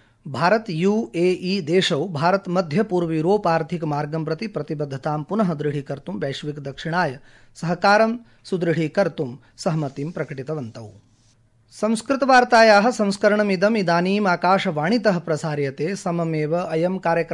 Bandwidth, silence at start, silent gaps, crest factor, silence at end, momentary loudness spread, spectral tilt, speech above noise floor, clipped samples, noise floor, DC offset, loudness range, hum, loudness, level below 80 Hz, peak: 11.5 kHz; 0.25 s; none; 18 dB; 0 s; 13 LU; -6 dB/octave; 37 dB; under 0.1%; -58 dBFS; under 0.1%; 9 LU; none; -21 LUFS; -60 dBFS; -4 dBFS